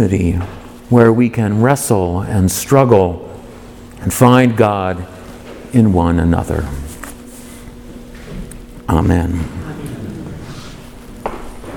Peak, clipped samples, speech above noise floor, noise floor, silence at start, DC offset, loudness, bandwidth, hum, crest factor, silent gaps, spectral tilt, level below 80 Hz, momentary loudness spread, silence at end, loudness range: 0 dBFS; under 0.1%; 22 dB; -34 dBFS; 0 s; under 0.1%; -14 LUFS; 19 kHz; none; 16 dB; none; -6.5 dB/octave; -32 dBFS; 24 LU; 0 s; 8 LU